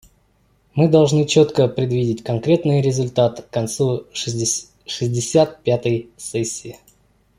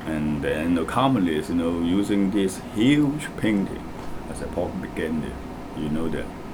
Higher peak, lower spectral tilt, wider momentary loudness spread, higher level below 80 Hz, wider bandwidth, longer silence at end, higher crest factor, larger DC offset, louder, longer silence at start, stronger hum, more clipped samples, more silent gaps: first, -2 dBFS vs -6 dBFS; about the same, -5.5 dB/octave vs -6.5 dB/octave; second, 10 LU vs 13 LU; second, -54 dBFS vs -42 dBFS; second, 15 kHz vs 19 kHz; first, 0.65 s vs 0 s; about the same, 16 dB vs 18 dB; neither; first, -19 LUFS vs -24 LUFS; first, 0.75 s vs 0 s; neither; neither; neither